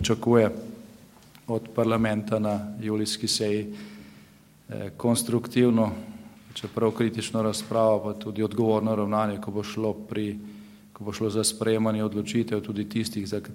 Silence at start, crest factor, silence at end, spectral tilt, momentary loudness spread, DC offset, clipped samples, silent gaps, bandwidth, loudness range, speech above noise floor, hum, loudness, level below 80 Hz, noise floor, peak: 0 s; 20 dB; 0 s; -5 dB/octave; 16 LU; under 0.1%; under 0.1%; none; 16 kHz; 2 LU; 28 dB; none; -26 LUFS; -60 dBFS; -54 dBFS; -6 dBFS